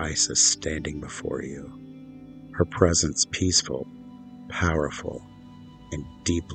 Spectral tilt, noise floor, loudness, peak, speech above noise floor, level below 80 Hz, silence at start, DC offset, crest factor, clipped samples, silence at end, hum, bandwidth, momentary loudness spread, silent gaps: -3 dB/octave; -46 dBFS; -24 LUFS; -4 dBFS; 20 dB; -44 dBFS; 0 s; under 0.1%; 24 dB; under 0.1%; 0 s; none; 9.6 kHz; 24 LU; none